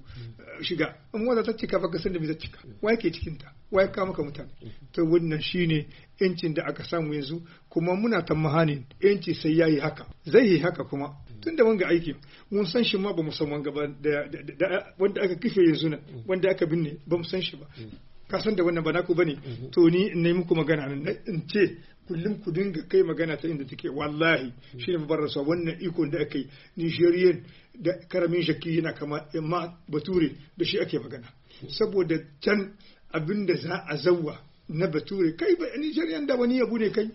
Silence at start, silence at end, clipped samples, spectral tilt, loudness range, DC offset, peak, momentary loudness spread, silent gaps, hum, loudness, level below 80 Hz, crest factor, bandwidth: 0.05 s; 0 s; under 0.1%; -5 dB/octave; 4 LU; under 0.1%; -6 dBFS; 13 LU; none; none; -27 LUFS; -54 dBFS; 20 dB; 6 kHz